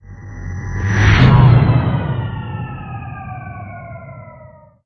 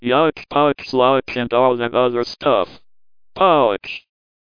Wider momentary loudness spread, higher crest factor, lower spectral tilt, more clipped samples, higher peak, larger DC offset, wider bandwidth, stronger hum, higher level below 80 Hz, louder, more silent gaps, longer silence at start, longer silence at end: first, 23 LU vs 8 LU; about the same, 16 dB vs 16 dB; about the same, -7.5 dB/octave vs -6.5 dB/octave; neither; about the same, 0 dBFS vs -2 dBFS; second, under 0.1% vs 0.4%; first, 6.4 kHz vs 5.2 kHz; neither; first, -28 dBFS vs -54 dBFS; first, -14 LUFS vs -17 LUFS; neither; about the same, 0.1 s vs 0 s; about the same, 0.4 s vs 0.4 s